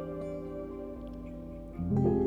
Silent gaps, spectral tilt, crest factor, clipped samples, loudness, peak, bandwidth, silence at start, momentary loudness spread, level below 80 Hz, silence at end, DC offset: none; -11 dB/octave; 18 dB; under 0.1%; -36 LUFS; -16 dBFS; 7.4 kHz; 0 s; 14 LU; -48 dBFS; 0 s; under 0.1%